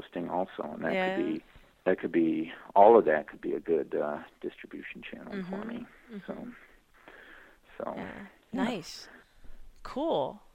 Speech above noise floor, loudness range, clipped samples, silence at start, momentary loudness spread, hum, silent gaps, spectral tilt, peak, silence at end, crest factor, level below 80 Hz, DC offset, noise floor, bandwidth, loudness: 26 dB; 15 LU; under 0.1%; 0 s; 19 LU; none; none; -6.5 dB/octave; -6 dBFS; 0.2 s; 26 dB; -60 dBFS; under 0.1%; -56 dBFS; 12.5 kHz; -29 LUFS